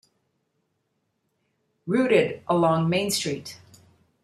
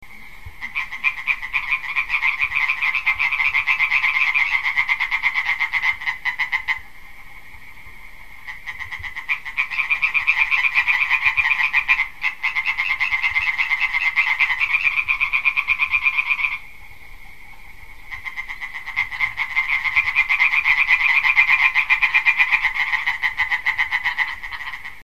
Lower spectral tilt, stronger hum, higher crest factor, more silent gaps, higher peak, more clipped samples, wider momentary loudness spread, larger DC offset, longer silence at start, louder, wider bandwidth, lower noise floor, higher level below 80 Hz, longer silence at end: first, -5 dB/octave vs -0.5 dB/octave; neither; about the same, 20 dB vs 22 dB; neither; second, -6 dBFS vs 0 dBFS; neither; about the same, 15 LU vs 14 LU; second, under 0.1% vs 1%; first, 1.85 s vs 0 s; second, -23 LUFS vs -18 LUFS; about the same, 14.5 kHz vs 14 kHz; first, -75 dBFS vs -42 dBFS; second, -68 dBFS vs -46 dBFS; first, 0.65 s vs 0 s